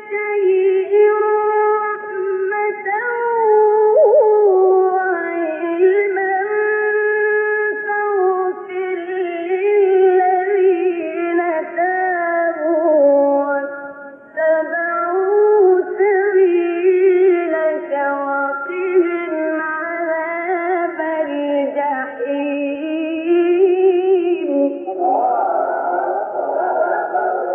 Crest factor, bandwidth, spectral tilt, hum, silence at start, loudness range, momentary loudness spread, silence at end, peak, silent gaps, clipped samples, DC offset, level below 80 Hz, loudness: 12 dB; 3.4 kHz; -8 dB/octave; none; 0 s; 5 LU; 9 LU; 0 s; -4 dBFS; none; under 0.1%; under 0.1%; -78 dBFS; -16 LUFS